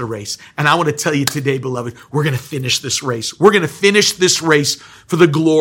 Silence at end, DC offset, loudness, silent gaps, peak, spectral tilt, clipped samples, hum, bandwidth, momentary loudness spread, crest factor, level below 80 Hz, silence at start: 0 s; under 0.1%; -15 LUFS; none; 0 dBFS; -4 dB/octave; 0.2%; none; over 20 kHz; 11 LU; 16 dB; -56 dBFS; 0 s